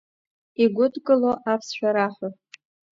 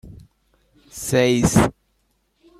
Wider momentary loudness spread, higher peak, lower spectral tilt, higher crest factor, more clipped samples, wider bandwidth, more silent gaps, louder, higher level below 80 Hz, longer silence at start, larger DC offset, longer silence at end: about the same, 14 LU vs 15 LU; second, -6 dBFS vs -2 dBFS; about the same, -5.5 dB/octave vs -5 dB/octave; about the same, 18 dB vs 20 dB; neither; second, 7.6 kHz vs 15.5 kHz; neither; second, -22 LUFS vs -19 LUFS; second, -70 dBFS vs -42 dBFS; first, 0.6 s vs 0.05 s; neither; second, 0.65 s vs 0.9 s